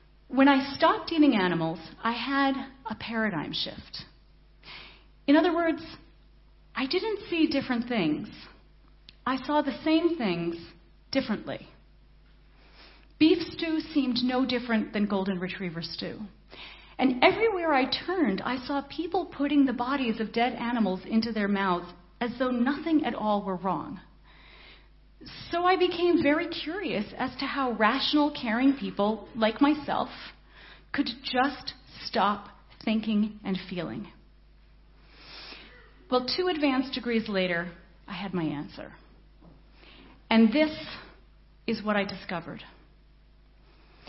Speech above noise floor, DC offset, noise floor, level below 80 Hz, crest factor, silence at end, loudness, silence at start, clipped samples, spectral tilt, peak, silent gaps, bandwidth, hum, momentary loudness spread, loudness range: 30 dB; under 0.1%; -57 dBFS; -56 dBFS; 24 dB; 1.4 s; -27 LUFS; 0.3 s; under 0.1%; -8 dB/octave; -6 dBFS; none; 6 kHz; none; 18 LU; 5 LU